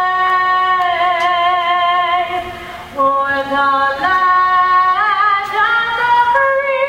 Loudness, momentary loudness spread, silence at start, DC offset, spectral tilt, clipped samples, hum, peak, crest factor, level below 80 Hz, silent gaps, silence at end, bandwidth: -13 LUFS; 5 LU; 0 s; under 0.1%; -3.5 dB/octave; under 0.1%; none; -2 dBFS; 12 dB; -50 dBFS; none; 0 s; 16 kHz